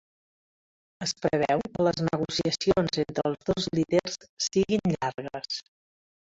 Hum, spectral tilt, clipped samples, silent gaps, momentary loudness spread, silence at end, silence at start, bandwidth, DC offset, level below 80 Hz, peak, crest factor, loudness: none; -5 dB/octave; under 0.1%; 4.29-4.37 s; 9 LU; 0.7 s; 1 s; 8 kHz; under 0.1%; -56 dBFS; -8 dBFS; 20 dB; -28 LUFS